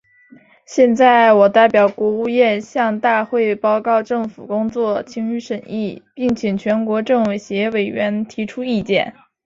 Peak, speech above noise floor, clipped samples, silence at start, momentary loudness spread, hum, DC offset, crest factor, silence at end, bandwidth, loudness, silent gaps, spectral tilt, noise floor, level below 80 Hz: -2 dBFS; 32 dB; under 0.1%; 0.7 s; 13 LU; none; under 0.1%; 16 dB; 0.35 s; 7.6 kHz; -17 LUFS; none; -6 dB/octave; -48 dBFS; -58 dBFS